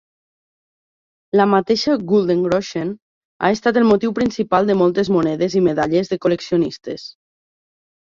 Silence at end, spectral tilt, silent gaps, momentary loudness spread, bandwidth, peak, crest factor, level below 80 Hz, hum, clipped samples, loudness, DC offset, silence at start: 1 s; -6.5 dB/octave; 3.02-3.40 s; 11 LU; 7.6 kHz; -2 dBFS; 16 dB; -54 dBFS; none; under 0.1%; -18 LUFS; under 0.1%; 1.35 s